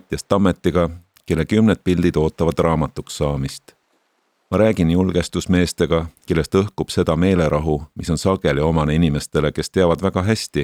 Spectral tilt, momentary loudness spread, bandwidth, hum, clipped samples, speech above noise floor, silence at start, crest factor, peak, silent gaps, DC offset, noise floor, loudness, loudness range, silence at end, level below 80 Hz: -6.5 dB/octave; 7 LU; 15 kHz; none; under 0.1%; 48 dB; 0.1 s; 18 dB; 0 dBFS; none; under 0.1%; -66 dBFS; -19 LUFS; 2 LU; 0 s; -36 dBFS